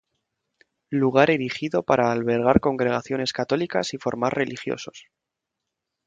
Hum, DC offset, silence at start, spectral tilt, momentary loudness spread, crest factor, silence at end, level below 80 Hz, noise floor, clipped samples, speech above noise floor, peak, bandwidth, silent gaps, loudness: none; under 0.1%; 0.9 s; -5.5 dB/octave; 10 LU; 24 dB; 1.05 s; -50 dBFS; -83 dBFS; under 0.1%; 61 dB; 0 dBFS; 9.2 kHz; none; -23 LUFS